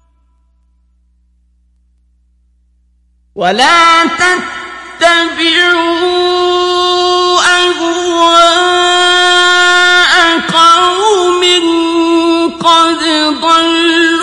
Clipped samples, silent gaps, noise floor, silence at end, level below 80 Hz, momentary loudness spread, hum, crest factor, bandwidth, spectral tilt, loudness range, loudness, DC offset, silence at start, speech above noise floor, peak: 0.3%; none; -52 dBFS; 0 s; -48 dBFS; 6 LU; 60 Hz at -50 dBFS; 10 dB; 11.5 kHz; -1.5 dB/octave; 5 LU; -8 LUFS; under 0.1%; 3.35 s; 43 dB; 0 dBFS